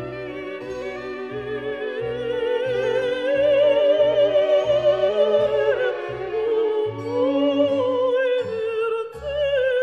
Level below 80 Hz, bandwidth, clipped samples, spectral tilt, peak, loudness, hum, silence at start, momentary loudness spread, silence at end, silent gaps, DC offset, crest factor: -54 dBFS; 7 kHz; under 0.1%; -6 dB/octave; -8 dBFS; -21 LUFS; none; 0 s; 13 LU; 0 s; none; under 0.1%; 14 dB